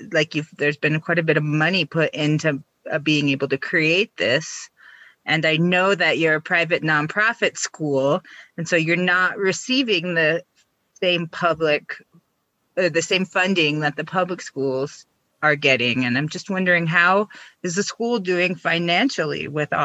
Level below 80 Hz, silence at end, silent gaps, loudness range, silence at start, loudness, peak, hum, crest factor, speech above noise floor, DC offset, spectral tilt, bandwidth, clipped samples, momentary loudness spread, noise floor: -66 dBFS; 0 s; none; 3 LU; 0 s; -20 LUFS; -4 dBFS; none; 18 dB; 50 dB; under 0.1%; -4.5 dB/octave; 8.6 kHz; under 0.1%; 9 LU; -70 dBFS